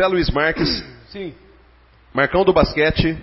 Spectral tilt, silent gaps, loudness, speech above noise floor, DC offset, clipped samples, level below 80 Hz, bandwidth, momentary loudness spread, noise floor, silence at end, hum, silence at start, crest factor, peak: -9 dB/octave; none; -18 LUFS; 33 dB; under 0.1%; under 0.1%; -32 dBFS; 5.8 kHz; 17 LU; -51 dBFS; 0 s; none; 0 s; 18 dB; -2 dBFS